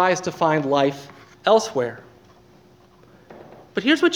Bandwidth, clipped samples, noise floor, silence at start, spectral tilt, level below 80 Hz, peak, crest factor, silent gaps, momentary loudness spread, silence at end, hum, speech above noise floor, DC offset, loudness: 18.5 kHz; under 0.1%; -52 dBFS; 0 s; -4.5 dB/octave; -64 dBFS; -4 dBFS; 20 dB; none; 18 LU; 0 s; none; 32 dB; under 0.1%; -21 LUFS